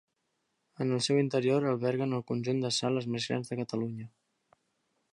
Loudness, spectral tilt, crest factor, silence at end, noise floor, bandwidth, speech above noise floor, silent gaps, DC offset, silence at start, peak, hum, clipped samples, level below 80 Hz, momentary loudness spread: -31 LUFS; -5.5 dB/octave; 16 dB; 1.05 s; -80 dBFS; 11 kHz; 49 dB; none; under 0.1%; 0.8 s; -16 dBFS; none; under 0.1%; -76 dBFS; 8 LU